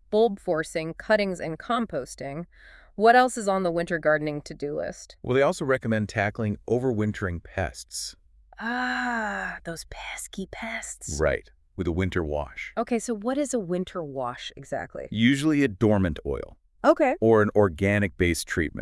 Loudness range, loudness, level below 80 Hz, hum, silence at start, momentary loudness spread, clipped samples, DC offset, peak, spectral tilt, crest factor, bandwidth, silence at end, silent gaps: 7 LU; -26 LUFS; -48 dBFS; none; 0.1 s; 14 LU; under 0.1%; under 0.1%; -6 dBFS; -5.5 dB/octave; 20 dB; 12 kHz; 0 s; none